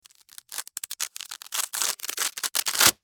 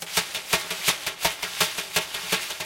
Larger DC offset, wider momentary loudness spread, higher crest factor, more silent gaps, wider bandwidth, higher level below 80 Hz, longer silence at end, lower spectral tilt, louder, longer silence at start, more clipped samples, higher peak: neither; first, 15 LU vs 3 LU; about the same, 26 dB vs 24 dB; neither; first, over 20 kHz vs 17 kHz; second, -64 dBFS vs -56 dBFS; about the same, 0.1 s vs 0 s; second, 1 dB/octave vs -0.5 dB/octave; about the same, -26 LUFS vs -25 LUFS; first, 0.5 s vs 0 s; neither; about the same, -2 dBFS vs -2 dBFS